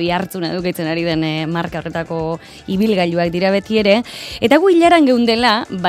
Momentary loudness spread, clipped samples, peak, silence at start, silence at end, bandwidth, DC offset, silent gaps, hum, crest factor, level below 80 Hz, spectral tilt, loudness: 12 LU; under 0.1%; 0 dBFS; 0 s; 0 s; 15.5 kHz; under 0.1%; none; none; 16 dB; -46 dBFS; -6 dB/octave; -16 LUFS